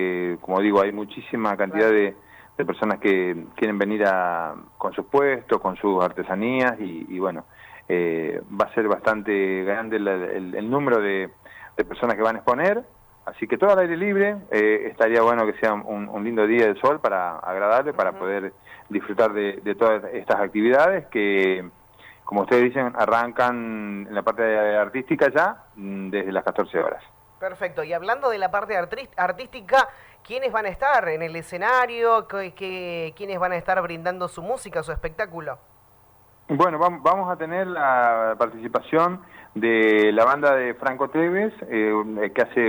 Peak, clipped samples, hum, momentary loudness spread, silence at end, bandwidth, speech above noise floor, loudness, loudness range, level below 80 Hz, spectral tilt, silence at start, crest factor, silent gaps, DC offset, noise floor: -8 dBFS; under 0.1%; none; 11 LU; 0 s; over 20 kHz; 32 dB; -22 LUFS; 4 LU; -54 dBFS; -6.5 dB/octave; 0 s; 16 dB; none; under 0.1%; -55 dBFS